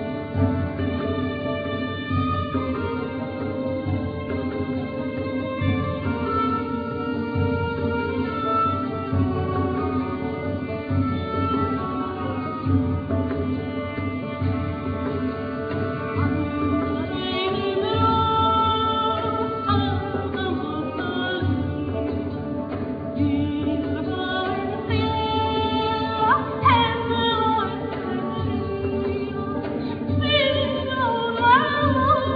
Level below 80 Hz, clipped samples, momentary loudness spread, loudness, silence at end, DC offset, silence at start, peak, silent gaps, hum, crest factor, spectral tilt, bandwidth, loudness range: -44 dBFS; under 0.1%; 8 LU; -24 LUFS; 0 s; under 0.1%; 0 s; -6 dBFS; none; none; 18 dB; -9.5 dB/octave; 5 kHz; 5 LU